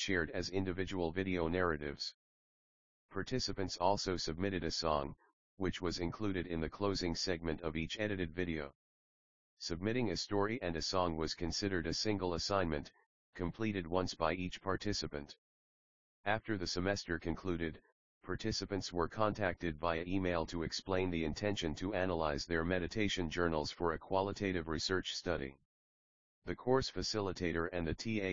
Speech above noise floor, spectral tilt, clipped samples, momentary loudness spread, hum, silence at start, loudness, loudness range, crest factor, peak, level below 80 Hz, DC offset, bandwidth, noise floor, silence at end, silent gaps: over 53 dB; -4 dB/octave; under 0.1%; 7 LU; none; 0 s; -38 LUFS; 3 LU; 22 dB; -16 dBFS; -56 dBFS; 0.2%; 7.4 kHz; under -90 dBFS; 0 s; 2.14-3.09 s, 5.33-5.57 s, 8.75-9.57 s, 13.06-13.33 s, 15.38-16.24 s, 17.92-18.21 s, 25.65-26.42 s